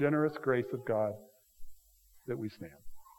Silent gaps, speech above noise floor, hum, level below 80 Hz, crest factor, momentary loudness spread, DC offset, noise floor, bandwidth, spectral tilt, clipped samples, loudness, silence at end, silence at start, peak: none; 30 dB; none; -60 dBFS; 20 dB; 19 LU; under 0.1%; -63 dBFS; 17.5 kHz; -8 dB/octave; under 0.1%; -34 LUFS; 0.15 s; 0 s; -16 dBFS